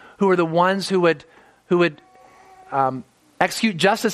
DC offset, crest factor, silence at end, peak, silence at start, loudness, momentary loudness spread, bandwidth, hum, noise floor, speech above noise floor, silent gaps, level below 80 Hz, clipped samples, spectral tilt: under 0.1%; 20 dB; 0 s; 0 dBFS; 0.2 s; -20 LUFS; 6 LU; 14.5 kHz; none; -49 dBFS; 30 dB; none; -64 dBFS; under 0.1%; -5 dB/octave